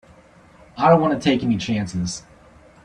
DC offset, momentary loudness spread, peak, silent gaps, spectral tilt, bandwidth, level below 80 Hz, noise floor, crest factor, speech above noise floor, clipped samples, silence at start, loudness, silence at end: under 0.1%; 14 LU; -2 dBFS; none; -6 dB/octave; 10.5 kHz; -52 dBFS; -49 dBFS; 20 dB; 31 dB; under 0.1%; 0.75 s; -20 LUFS; 0.65 s